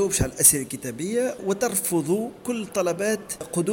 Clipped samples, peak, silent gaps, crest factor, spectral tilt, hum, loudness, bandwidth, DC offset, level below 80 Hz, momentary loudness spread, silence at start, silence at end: under 0.1%; -2 dBFS; none; 22 dB; -3.5 dB/octave; none; -23 LUFS; 17 kHz; under 0.1%; -46 dBFS; 13 LU; 0 s; 0 s